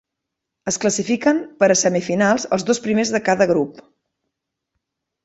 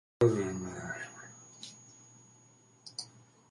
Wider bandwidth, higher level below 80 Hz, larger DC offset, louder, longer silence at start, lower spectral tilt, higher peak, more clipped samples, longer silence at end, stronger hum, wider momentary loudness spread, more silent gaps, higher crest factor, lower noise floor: second, 8.2 kHz vs 11.5 kHz; about the same, -60 dBFS vs -64 dBFS; neither; first, -18 LUFS vs -35 LUFS; first, 0.65 s vs 0.2 s; second, -4 dB/octave vs -5.5 dB/octave; first, -2 dBFS vs -12 dBFS; neither; first, 1.45 s vs 0.45 s; neither; second, 5 LU vs 25 LU; neither; second, 18 dB vs 24 dB; first, -81 dBFS vs -62 dBFS